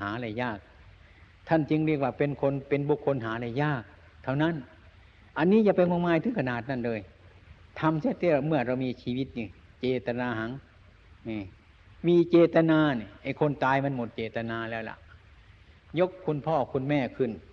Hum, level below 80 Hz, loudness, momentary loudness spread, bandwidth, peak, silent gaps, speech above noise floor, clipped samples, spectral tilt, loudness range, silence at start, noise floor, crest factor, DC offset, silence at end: none; -58 dBFS; -28 LUFS; 15 LU; 6.4 kHz; -10 dBFS; none; 28 dB; under 0.1%; -9 dB/octave; 6 LU; 0 s; -55 dBFS; 18 dB; under 0.1%; 0.1 s